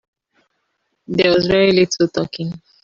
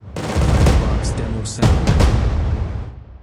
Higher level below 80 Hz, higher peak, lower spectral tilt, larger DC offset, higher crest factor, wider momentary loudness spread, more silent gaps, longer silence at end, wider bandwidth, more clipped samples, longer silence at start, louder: second, -50 dBFS vs -20 dBFS; about the same, -2 dBFS vs -2 dBFS; about the same, -5 dB/octave vs -6 dB/octave; neither; about the same, 16 dB vs 16 dB; first, 12 LU vs 9 LU; neither; first, 0.25 s vs 0.05 s; second, 7.4 kHz vs 12.5 kHz; neither; first, 1.1 s vs 0.05 s; about the same, -16 LUFS vs -18 LUFS